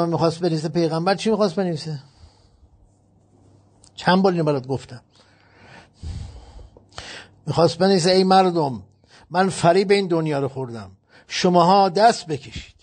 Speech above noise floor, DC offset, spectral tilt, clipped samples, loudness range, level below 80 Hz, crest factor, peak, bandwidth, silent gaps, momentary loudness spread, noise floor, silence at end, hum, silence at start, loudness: 38 dB; under 0.1%; -5.5 dB/octave; under 0.1%; 7 LU; -50 dBFS; 18 dB; -4 dBFS; 9.4 kHz; none; 21 LU; -57 dBFS; 0.15 s; none; 0 s; -19 LUFS